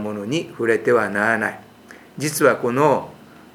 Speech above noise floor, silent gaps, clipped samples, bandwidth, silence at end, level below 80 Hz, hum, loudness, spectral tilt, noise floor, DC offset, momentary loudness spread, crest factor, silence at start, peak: 25 dB; none; under 0.1%; 18 kHz; 0.4 s; -64 dBFS; none; -20 LUFS; -5 dB/octave; -45 dBFS; under 0.1%; 12 LU; 20 dB; 0 s; 0 dBFS